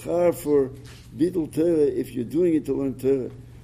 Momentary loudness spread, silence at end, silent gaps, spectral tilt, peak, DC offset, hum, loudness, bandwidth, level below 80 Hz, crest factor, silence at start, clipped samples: 9 LU; 0 s; none; -7.5 dB/octave; -8 dBFS; under 0.1%; none; -24 LUFS; 15.5 kHz; -50 dBFS; 14 dB; 0 s; under 0.1%